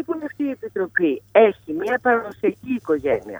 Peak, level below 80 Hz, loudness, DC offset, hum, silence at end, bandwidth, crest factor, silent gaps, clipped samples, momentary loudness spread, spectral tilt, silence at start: -2 dBFS; -58 dBFS; -21 LUFS; under 0.1%; none; 0 s; over 20 kHz; 20 dB; none; under 0.1%; 11 LU; -7 dB/octave; 0 s